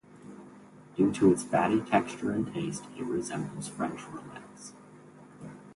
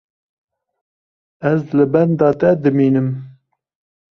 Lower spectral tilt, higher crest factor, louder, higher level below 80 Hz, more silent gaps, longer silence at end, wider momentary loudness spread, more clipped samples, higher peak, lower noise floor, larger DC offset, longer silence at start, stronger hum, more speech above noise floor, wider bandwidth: second, -6 dB/octave vs -10.5 dB/octave; first, 22 dB vs 16 dB; second, -29 LUFS vs -16 LUFS; second, -64 dBFS vs -56 dBFS; neither; second, 0.05 s vs 0.85 s; first, 24 LU vs 9 LU; neither; second, -10 dBFS vs -2 dBFS; about the same, -52 dBFS vs -49 dBFS; neither; second, 0.15 s vs 1.4 s; neither; second, 23 dB vs 34 dB; first, 11.5 kHz vs 6.2 kHz